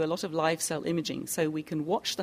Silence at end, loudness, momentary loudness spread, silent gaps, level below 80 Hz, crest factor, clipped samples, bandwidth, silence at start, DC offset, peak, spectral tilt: 0 s; -30 LUFS; 4 LU; none; -68 dBFS; 18 dB; under 0.1%; 15.5 kHz; 0 s; under 0.1%; -14 dBFS; -4 dB/octave